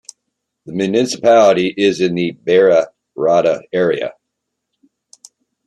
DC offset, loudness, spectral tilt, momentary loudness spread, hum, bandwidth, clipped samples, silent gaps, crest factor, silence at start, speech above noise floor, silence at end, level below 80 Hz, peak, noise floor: under 0.1%; -14 LUFS; -5 dB/octave; 11 LU; none; 12 kHz; under 0.1%; none; 16 dB; 0.65 s; 62 dB; 1.55 s; -62 dBFS; 0 dBFS; -76 dBFS